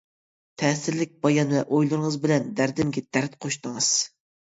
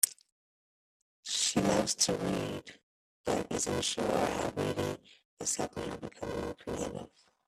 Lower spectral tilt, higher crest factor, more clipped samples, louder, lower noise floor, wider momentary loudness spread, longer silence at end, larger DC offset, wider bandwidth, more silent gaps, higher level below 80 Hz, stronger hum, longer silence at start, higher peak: first, -4.5 dB/octave vs -3 dB/octave; second, 18 dB vs 28 dB; neither; first, -24 LUFS vs -33 LUFS; about the same, under -90 dBFS vs under -90 dBFS; second, 7 LU vs 13 LU; about the same, 0.35 s vs 0.4 s; neither; second, 8 kHz vs 15.5 kHz; second, none vs 0.32-1.23 s, 2.83-3.24 s, 5.25-5.37 s; about the same, -64 dBFS vs -60 dBFS; neither; first, 0.6 s vs 0.05 s; about the same, -6 dBFS vs -6 dBFS